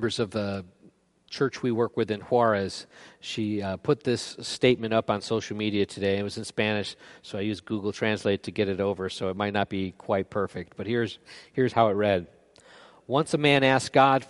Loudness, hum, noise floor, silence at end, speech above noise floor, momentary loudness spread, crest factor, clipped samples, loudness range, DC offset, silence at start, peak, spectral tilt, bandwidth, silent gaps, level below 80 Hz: -27 LUFS; none; -59 dBFS; 0.05 s; 33 dB; 11 LU; 22 dB; under 0.1%; 3 LU; under 0.1%; 0 s; -6 dBFS; -5.5 dB/octave; 11.5 kHz; none; -64 dBFS